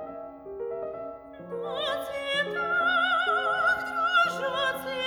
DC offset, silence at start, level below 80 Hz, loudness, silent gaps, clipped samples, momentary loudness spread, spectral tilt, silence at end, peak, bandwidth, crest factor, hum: under 0.1%; 0 s; -64 dBFS; -26 LUFS; none; under 0.1%; 16 LU; -3 dB/octave; 0 s; -12 dBFS; over 20 kHz; 16 dB; none